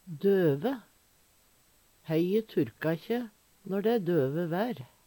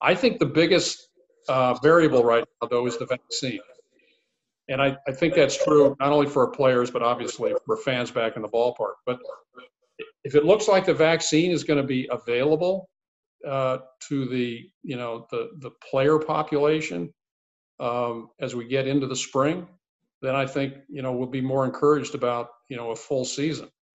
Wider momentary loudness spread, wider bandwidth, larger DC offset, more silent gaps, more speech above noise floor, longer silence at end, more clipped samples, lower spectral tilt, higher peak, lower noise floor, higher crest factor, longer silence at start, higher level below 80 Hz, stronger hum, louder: second, 11 LU vs 14 LU; first, 19 kHz vs 8.4 kHz; neither; second, none vs 13.08-13.39 s, 14.74-14.81 s, 17.31-17.78 s, 19.89-19.99 s, 20.14-20.21 s; second, 36 dB vs 53 dB; about the same, 0.2 s vs 0.3 s; neither; first, -8 dB/octave vs -5 dB/octave; second, -16 dBFS vs -4 dBFS; second, -65 dBFS vs -77 dBFS; about the same, 16 dB vs 20 dB; about the same, 0.05 s vs 0 s; second, -72 dBFS vs -62 dBFS; neither; second, -30 LUFS vs -24 LUFS